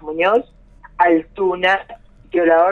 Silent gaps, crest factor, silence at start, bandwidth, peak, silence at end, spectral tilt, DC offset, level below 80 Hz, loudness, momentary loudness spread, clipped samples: none; 16 dB; 0.05 s; 6.8 kHz; -2 dBFS; 0 s; -6 dB/octave; under 0.1%; -48 dBFS; -17 LUFS; 6 LU; under 0.1%